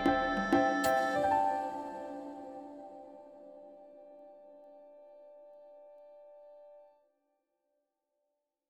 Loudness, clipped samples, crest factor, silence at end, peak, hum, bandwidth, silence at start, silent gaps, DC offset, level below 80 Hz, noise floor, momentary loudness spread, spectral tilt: -32 LUFS; under 0.1%; 22 dB; 1.9 s; -14 dBFS; none; 19 kHz; 0 s; none; under 0.1%; -62 dBFS; -85 dBFS; 27 LU; -4.5 dB/octave